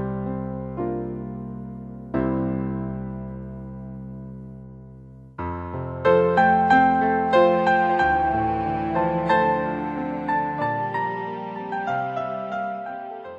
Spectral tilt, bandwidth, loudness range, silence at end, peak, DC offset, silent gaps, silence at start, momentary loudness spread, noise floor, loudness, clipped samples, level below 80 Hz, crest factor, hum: -8 dB/octave; 8 kHz; 11 LU; 0 s; -6 dBFS; under 0.1%; none; 0 s; 19 LU; -43 dBFS; -23 LUFS; under 0.1%; -46 dBFS; 18 dB; none